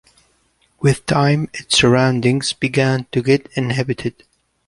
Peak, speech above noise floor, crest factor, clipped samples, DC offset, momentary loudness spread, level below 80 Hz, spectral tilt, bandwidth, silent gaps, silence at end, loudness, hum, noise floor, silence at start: -2 dBFS; 44 dB; 16 dB; under 0.1%; under 0.1%; 7 LU; -48 dBFS; -5 dB/octave; 11.5 kHz; none; 0.6 s; -17 LUFS; none; -61 dBFS; 0.8 s